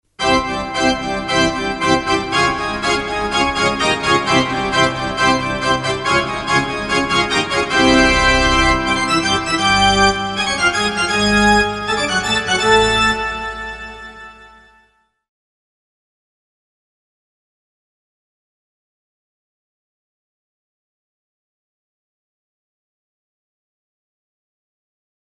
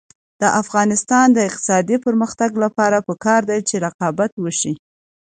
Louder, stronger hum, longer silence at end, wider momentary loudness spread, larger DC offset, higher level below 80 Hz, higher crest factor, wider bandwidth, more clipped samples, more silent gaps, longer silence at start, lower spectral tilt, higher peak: about the same, -15 LUFS vs -17 LUFS; neither; first, 10.85 s vs 0.55 s; about the same, 6 LU vs 7 LU; neither; first, -34 dBFS vs -62 dBFS; about the same, 18 dB vs 16 dB; first, 11.5 kHz vs 9.6 kHz; neither; second, none vs 3.94-3.99 s, 4.32-4.37 s; second, 0.2 s vs 0.4 s; about the same, -3.5 dB/octave vs -4.5 dB/octave; about the same, 0 dBFS vs -2 dBFS